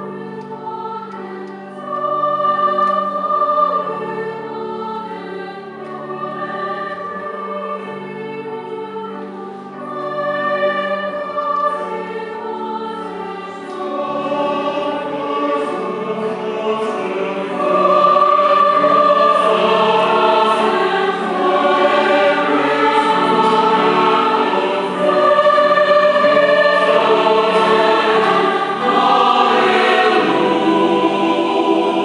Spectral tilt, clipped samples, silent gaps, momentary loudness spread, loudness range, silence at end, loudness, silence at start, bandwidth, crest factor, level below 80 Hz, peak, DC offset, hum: -5 dB/octave; under 0.1%; none; 15 LU; 13 LU; 0 s; -15 LUFS; 0 s; 11 kHz; 16 dB; -68 dBFS; 0 dBFS; under 0.1%; none